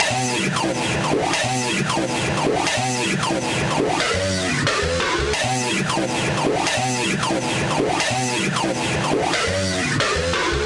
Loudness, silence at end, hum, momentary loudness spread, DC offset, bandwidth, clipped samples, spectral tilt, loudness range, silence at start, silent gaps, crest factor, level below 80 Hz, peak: -20 LUFS; 0 s; none; 2 LU; under 0.1%; 11.5 kHz; under 0.1%; -3.5 dB/octave; 0 LU; 0 s; none; 16 dB; -42 dBFS; -6 dBFS